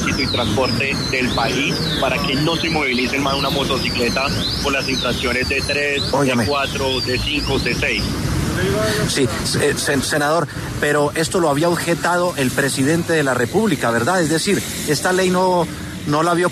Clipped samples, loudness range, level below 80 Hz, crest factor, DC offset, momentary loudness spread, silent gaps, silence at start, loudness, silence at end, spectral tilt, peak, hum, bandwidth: under 0.1%; 1 LU; -36 dBFS; 12 dB; under 0.1%; 2 LU; none; 0 s; -18 LUFS; 0 s; -4 dB/octave; -6 dBFS; none; 13.5 kHz